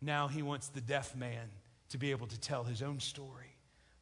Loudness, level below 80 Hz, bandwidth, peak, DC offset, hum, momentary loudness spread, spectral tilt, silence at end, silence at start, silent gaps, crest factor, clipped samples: -40 LUFS; -70 dBFS; 11 kHz; -20 dBFS; under 0.1%; none; 15 LU; -4.5 dB/octave; 0.5 s; 0 s; none; 20 dB; under 0.1%